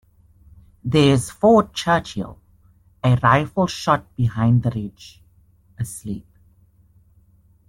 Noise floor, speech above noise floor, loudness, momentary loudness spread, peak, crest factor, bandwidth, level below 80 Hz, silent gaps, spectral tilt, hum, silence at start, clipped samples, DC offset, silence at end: -55 dBFS; 36 dB; -19 LUFS; 17 LU; -4 dBFS; 18 dB; 13 kHz; -48 dBFS; none; -6.5 dB/octave; none; 0.85 s; under 0.1%; under 0.1%; 1.5 s